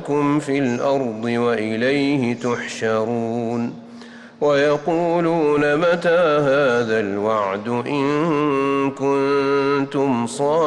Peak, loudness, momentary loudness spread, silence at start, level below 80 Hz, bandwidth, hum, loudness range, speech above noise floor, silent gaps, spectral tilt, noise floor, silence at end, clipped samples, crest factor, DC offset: -8 dBFS; -19 LUFS; 6 LU; 0 s; -60 dBFS; 11 kHz; none; 3 LU; 21 dB; none; -6 dB/octave; -39 dBFS; 0 s; under 0.1%; 10 dB; under 0.1%